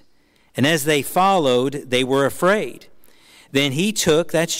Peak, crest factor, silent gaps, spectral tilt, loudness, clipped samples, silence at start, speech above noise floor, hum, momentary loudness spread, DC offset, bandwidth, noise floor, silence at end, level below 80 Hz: -6 dBFS; 12 dB; none; -4 dB/octave; -18 LUFS; under 0.1%; 0.55 s; 37 dB; none; 5 LU; under 0.1%; 16 kHz; -55 dBFS; 0 s; -54 dBFS